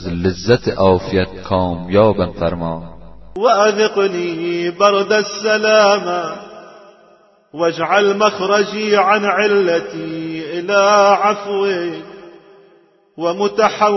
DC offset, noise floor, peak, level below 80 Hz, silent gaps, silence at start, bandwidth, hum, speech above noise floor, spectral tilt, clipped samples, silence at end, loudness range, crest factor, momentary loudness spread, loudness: under 0.1%; -51 dBFS; 0 dBFS; -46 dBFS; none; 0 s; 6.2 kHz; none; 37 dB; -5 dB/octave; under 0.1%; 0 s; 2 LU; 16 dB; 12 LU; -15 LUFS